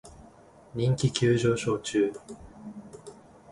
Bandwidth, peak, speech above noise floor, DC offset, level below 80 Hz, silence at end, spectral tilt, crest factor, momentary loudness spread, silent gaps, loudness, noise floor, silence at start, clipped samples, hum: 11.5 kHz; -10 dBFS; 27 dB; under 0.1%; -56 dBFS; 0 s; -6 dB/octave; 20 dB; 23 LU; none; -26 LUFS; -53 dBFS; 0.05 s; under 0.1%; none